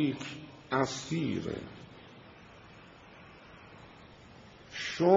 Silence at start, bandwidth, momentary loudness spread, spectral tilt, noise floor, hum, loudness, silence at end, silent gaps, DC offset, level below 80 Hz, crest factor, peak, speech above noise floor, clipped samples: 0 s; 7.6 kHz; 21 LU; -5 dB/octave; -54 dBFS; none; -35 LUFS; 0 s; none; under 0.1%; -66 dBFS; 24 dB; -12 dBFS; 20 dB; under 0.1%